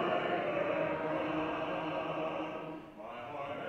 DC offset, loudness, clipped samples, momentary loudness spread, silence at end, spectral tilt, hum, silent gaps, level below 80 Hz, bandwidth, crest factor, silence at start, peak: under 0.1%; -36 LUFS; under 0.1%; 12 LU; 0 s; -7 dB/octave; none; none; -68 dBFS; 8.4 kHz; 16 dB; 0 s; -20 dBFS